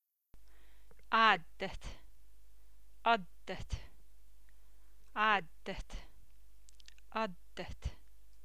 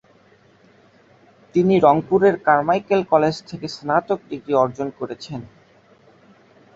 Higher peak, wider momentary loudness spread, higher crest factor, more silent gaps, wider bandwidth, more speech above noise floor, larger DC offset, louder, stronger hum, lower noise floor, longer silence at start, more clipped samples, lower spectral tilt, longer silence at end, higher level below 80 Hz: second, -12 dBFS vs -2 dBFS; first, 19 LU vs 16 LU; first, 26 dB vs 20 dB; neither; first, 16 kHz vs 7.8 kHz; second, 26 dB vs 35 dB; first, 0.5% vs under 0.1%; second, -35 LUFS vs -19 LUFS; neither; first, -64 dBFS vs -54 dBFS; second, 0 s vs 1.55 s; neither; second, -4 dB/octave vs -7 dB/octave; second, 0.5 s vs 1.3 s; about the same, -54 dBFS vs -58 dBFS